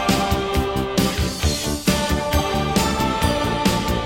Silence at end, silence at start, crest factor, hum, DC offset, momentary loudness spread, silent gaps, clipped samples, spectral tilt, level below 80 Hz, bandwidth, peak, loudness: 0 s; 0 s; 18 dB; none; 0.2%; 2 LU; none; under 0.1%; -4.5 dB/octave; -28 dBFS; 16.5 kHz; -2 dBFS; -20 LUFS